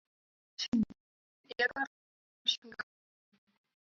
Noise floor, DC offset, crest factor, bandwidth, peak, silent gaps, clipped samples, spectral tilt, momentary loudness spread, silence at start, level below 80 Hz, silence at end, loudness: under -90 dBFS; under 0.1%; 22 dB; 7.4 kHz; -18 dBFS; 0.68-0.72 s, 1.00-1.44 s, 1.87-2.45 s, 2.58-2.62 s; under 0.1%; -1.5 dB/octave; 13 LU; 0.6 s; -68 dBFS; 1.15 s; -35 LUFS